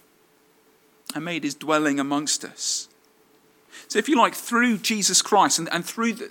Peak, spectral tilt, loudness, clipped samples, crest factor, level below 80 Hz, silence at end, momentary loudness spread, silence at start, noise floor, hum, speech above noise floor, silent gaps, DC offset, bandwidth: -4 dBFS; -2 dB/octave; -22 LUFS; under 0.1%; 20 dB; -82 dBFS; 0 s; 11 LU; 1.1 s; -60 dBFS; none; 37 dB; none; under 0.1%; 17.5 kHz